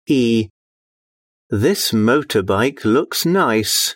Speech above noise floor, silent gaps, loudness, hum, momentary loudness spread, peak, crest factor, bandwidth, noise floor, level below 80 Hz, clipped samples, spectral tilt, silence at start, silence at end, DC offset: over 74 dB; 0.50-1.50 s; -17 LUFS; none; 4 LU; -4 dBFS; 14 dB; 16.5 kHz; under -90 dBFS; -56 dBFS; under 0.1%; -4 dB/octave; 0.1 s; 0 s; under 0.1%